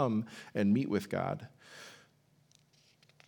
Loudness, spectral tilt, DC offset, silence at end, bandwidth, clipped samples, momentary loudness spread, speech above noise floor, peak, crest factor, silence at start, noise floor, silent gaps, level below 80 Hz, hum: -34 LUFS; -7.5 dB/octave; under 0.1%; 1.35 s; 18 kHz; under 0.1%; 21 LU; 35 dB; -16 dBFS; 20 dB; 0 s; -68 dBFS; none; -82 dBFS; none